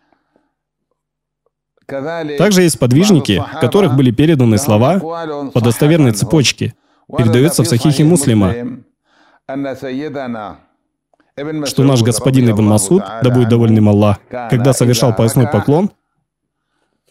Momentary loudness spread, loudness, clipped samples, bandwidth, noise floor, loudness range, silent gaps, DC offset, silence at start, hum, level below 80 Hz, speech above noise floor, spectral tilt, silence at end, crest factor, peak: 13 LU; -13 LUFS; under 0.1%; 16 kHz; -77 dBFS; 5 LU; none; under 0.1%; 1.9 s; none; -46 dBFS; 65 dB; -6 dB/octave; 1.2 s; 14 dB; 0 dBFS